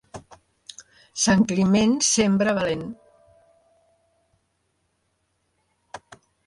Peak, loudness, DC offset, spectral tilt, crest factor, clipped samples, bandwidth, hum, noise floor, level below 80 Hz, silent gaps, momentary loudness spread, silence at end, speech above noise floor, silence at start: -8 dBFS; -20 LUFS; under 0.1%; -4 dB/octave; 18 dB; under 0.1%; 11.5 kHz; none; -72 dBFS; -56 dBFS; none; 25 LU; 0.5 s; 52 dB; 0.15 s